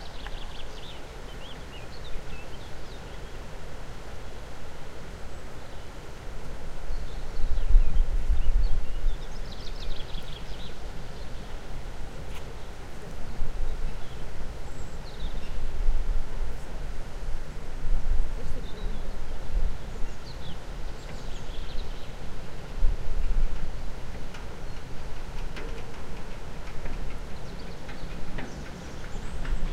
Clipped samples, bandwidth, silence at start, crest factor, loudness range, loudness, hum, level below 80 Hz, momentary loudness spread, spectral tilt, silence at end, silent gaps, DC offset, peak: under 0.1%; 7.8 kHz; 0 s; 20 dB; 10 LU; -38 LUFS; none; -28 dBFS; 10 LU; -5.5 dB/octave; 0 s; none; under 0.1%; -4 dBFS